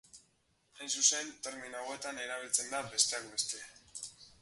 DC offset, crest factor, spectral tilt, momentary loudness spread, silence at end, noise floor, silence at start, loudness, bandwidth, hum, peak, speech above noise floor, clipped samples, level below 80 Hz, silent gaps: under 0.1%; 24 dB; 1 dB/octave; 17 LU; 0.15 s; -74 dBFS; 0.15 s; -33 LUFS; 12 kHz; none; -14 dBFS; 37 dB; under 0.1%; -76 dBFS; none